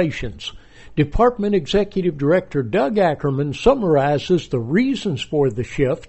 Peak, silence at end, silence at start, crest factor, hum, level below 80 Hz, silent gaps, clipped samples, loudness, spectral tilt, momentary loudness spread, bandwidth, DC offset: -2 dBFS; 0 s; 0 s; 16 dB; none; -36 dBFS; none; under 0.1%; -19 LUFS; -7 dB/octave; 6 LU; 8.2 kHz; under 0.1%